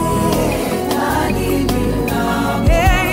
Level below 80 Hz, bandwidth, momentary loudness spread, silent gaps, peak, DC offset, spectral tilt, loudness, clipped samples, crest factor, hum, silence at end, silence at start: -22 dBFS; 16.5 kHz; 4 LU; none; 0 dBFS; under 0.1%; -5.5 dB/octave; -16 LUFS; under 0.1%; 14 dB; none; 0 s; 0 s